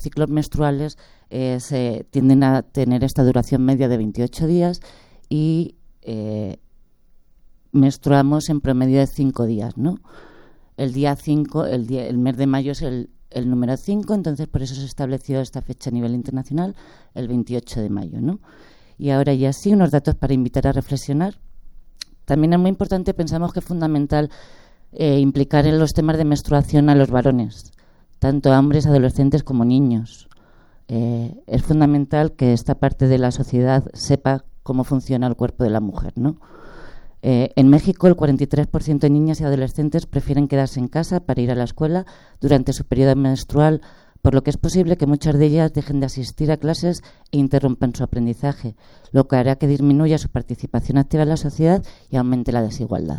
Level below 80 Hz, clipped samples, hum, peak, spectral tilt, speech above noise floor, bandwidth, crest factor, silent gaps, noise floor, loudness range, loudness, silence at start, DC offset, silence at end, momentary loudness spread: -36 dBFS; under 0.1%; none; 0 dBFS; -8 dB/octave; 32 dB; 12.5 kHz; 18 dB; none; -50 dBFS; 6 LU; -19 LUFS; 0 s; under 0.1%; 0 s; 10 LU